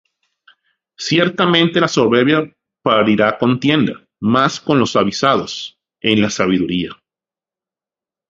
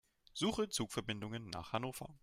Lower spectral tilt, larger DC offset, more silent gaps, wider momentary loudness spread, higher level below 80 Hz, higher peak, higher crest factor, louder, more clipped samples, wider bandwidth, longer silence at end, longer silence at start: about the same, -5 dB/octave vs -4 dB/octave; neither; neither; about the same, 10 LU vs 8 LU; first, -52 dBFS vs -64 dBFS; first, 0 dBFS vs -22 dBFS; about the same, 16 dB vs 20 dB; first, -15 LUFS vs -40 LUFS; neither; second, 7.8 kHz vs 16 kHz; first, 1.35 s vs 0.05 s; first, 1 s vs 0.35 s